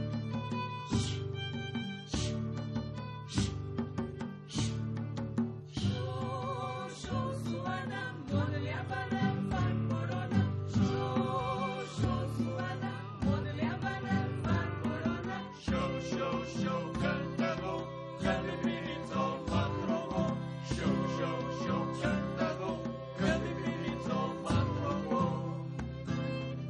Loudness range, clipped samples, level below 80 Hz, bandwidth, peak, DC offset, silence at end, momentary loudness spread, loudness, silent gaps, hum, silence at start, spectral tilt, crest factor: 4 LU; under 0.1%; -52 dBFS; 10.5 kHz; -18 dBFS; under 0.1%; 0 s; 6 LU; -35 LUFS; none; none; 0 s; -6.5 dB/octave; 16 dB